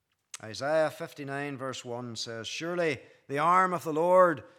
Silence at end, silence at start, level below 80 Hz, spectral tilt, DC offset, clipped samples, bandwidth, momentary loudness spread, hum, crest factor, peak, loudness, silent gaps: 0.1 s; 0.45 s; -82 dBFS; -4.5 dB/octave; under 0.1%; under 0.1%; 15.5 kHz; 15 LU; none; 20 dB; -8 dBFS; -29 LUFS; none